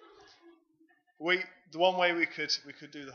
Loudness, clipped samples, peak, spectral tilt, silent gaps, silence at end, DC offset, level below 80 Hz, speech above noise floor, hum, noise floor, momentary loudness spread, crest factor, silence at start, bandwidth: -30 LUFS; under 0.1%; -12 dBFS; -3 dB/octave; none; 0 s; under 0.1%; -86 dBFS; 37 dB; none; -68 dBFS; 16 LU; 22 dB; 0.45 s; 7 kHz